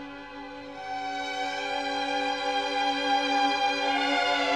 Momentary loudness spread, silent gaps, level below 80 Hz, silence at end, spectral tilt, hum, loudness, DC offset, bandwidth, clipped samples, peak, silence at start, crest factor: 16 LU; none; -64 dBFS; 0 s; -2 dB/octave; 50 Hz at -65 dBFS; -27 LUFS; 0.1%; 11.5 kHz; under 0.1%; -14 dBFS; 0 s; 14 dB